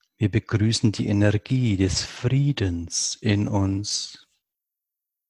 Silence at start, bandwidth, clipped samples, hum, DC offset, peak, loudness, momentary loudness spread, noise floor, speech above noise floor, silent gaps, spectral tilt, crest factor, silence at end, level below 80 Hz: 0.2 s; 11.5 kHz; under 0.1%; none; under 0.1%; -6 dBFS; -23 LUFS; 4 LU; -85 dBFS; 63 dB; none; -5 dB/octave; 18 dB; 1.15 s; -42 dBFS